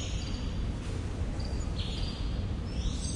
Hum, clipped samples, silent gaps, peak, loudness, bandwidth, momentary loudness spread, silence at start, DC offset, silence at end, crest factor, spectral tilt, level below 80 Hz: none; under 0.1%; none; -20 dBFS; -35 LUFS; 11 kHz; 1 LU; 0 s; under 0.1%; 0 s; 14 dB; -5 dB/octave; -36 dBFS